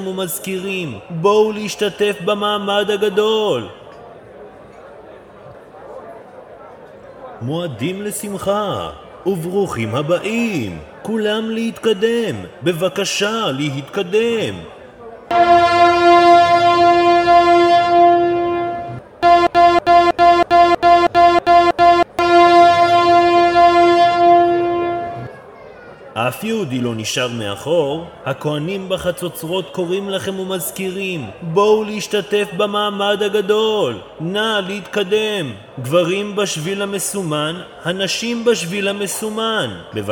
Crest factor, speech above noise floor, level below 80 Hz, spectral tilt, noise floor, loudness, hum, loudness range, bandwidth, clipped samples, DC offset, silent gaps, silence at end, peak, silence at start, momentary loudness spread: 16 dB; 20 dB; -48 dBFS; -4.5 dB/octave; -39 dBFS; -15 LUFS; none; 11 LU; 18.5 kHz; under 0.1%; under 0.1%; none; 0 s; 0 dBFS; 0 s; 13 LU